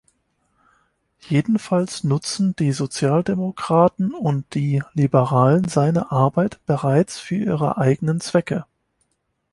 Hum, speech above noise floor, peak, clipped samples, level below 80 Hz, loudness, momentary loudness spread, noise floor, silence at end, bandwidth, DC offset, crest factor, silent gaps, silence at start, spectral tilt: none; 52 dB; -2 dBFS; under 0.1%; -56 dBFS; -20 LUFS; 6 LU; -71 dBFS; 0.9 s; 11.5 kHz; under 0.1%; 18 dB; none; 1.25 s; -7 dB/octave